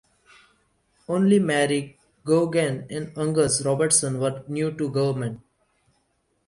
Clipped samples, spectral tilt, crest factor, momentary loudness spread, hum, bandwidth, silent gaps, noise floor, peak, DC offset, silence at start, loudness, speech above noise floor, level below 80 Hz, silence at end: under 0.1%; -4.5 dB/octave; 18 dB; 13 LU; none; 11.5 kHz; none; -70 dBFS; -6 dBFS; under 0.1%; 1.1 s; -23 LUFS; 47 dB; -60 dBFS; 1.1 s